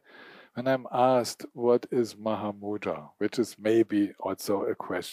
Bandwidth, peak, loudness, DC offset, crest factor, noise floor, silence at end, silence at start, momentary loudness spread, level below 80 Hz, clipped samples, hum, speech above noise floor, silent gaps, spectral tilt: 15.5 kHz; -10 dBFS; -28 LUFS; under 0.1%; 18 dB; -52 dBFS; 0 s; 0.15 s; 9 LU; -76 dBFS; under 0.1%; none; 24 dB; none; -5.5 dB/octave